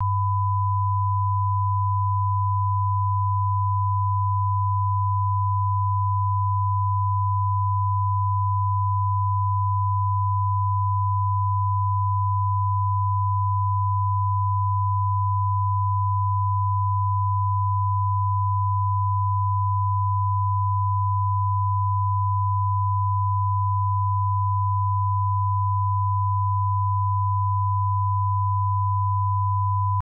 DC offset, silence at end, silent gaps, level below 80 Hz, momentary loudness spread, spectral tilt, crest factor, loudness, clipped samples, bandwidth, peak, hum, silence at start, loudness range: under 0.1%; 0 s; none; -58 dBFS; 0 LU; -14 dB/octave; 6 dB; -23 LUFS; under 0.1%; 1.1 kHz; -16 dBFS; none; 0 s; 0 LU